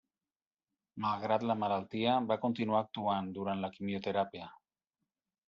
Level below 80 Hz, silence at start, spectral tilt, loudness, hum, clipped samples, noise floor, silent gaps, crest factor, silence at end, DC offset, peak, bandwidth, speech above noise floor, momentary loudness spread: -78 dBFS; 0.95 s; -4.5 dB/octave; -34 LUFS; none; under 0.1%; under -90 dBFS; none; 18 dB; 0.95 s; under 0.1%; -16 dBFS; 7 kHz; over 56 dB; 7 LU